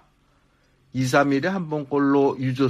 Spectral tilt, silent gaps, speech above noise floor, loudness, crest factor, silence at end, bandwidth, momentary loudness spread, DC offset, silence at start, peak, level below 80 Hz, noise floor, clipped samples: -6.5 dB/octave; none; 41 dB; -22 LUFS; 18 dB; 0 s; 15 kHz; 8 LU; under 0.1%; 0.95 s; -6 dBFS; -62 dBFS; -62 dBFS; under 0.1%